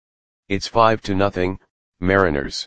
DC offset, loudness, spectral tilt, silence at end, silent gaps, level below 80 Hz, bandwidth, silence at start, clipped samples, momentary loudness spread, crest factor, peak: under 0.1%; -20 LUFS; -5.5 dB/octave; 0 s; 1.70-1.92 s; -42 dBFS; 9.6 kHz; 0.4 s; under 0.1%; 10 LU; 20 dB; 0 dBFS